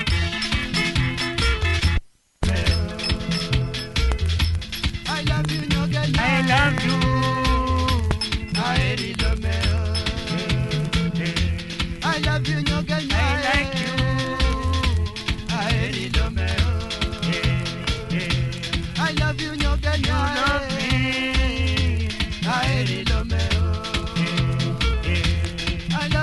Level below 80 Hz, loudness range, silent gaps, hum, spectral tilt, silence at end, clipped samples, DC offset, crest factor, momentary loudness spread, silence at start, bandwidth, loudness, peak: -28 dBFS; 3 LU; none; none; -5 dB/octave; 0 s; under 0.1%; under 0.1%; 20 dB; 5 LU; 0 s; 11.5 kHz; -22 LUFS; -2 dBFS